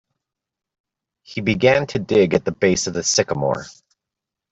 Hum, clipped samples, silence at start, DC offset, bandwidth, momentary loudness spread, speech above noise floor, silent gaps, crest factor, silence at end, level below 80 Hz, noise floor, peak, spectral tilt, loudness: none; under 0.1%; 1.3 s; under 0.1%; 8.2 kHz; 8 LU; 67 dB; none; 18 dB; 0.8 s; -52 dBFS; -85 dBFS; -2 dBFS; -4 dB/octave; -19 LUFS